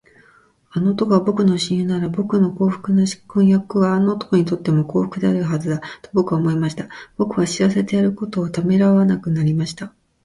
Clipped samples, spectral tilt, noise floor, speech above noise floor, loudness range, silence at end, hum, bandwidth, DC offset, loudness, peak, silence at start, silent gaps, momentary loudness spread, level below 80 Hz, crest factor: under 0.1%; -7 dB/octave; -54 dBFS; 36 dB; 3 LU; 0.35 s; none; 11.5 kHz; under 0.1%; -19 LUFS; -2 dBFS; 0.75 s; none; 8 LU; -54 dBFS; 16 dB